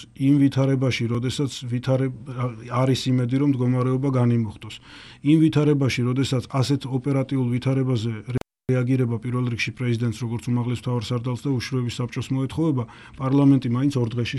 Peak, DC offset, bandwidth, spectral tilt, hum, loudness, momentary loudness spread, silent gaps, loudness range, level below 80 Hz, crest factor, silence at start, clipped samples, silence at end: -6 dBFS; under 0.1%; 12 kHz; -7 dB/octave; none; -23 LUFS; 10 LU; none; 4 LU; -54 dBFS; 16 dB; 0 s; under 0.1%; 0 s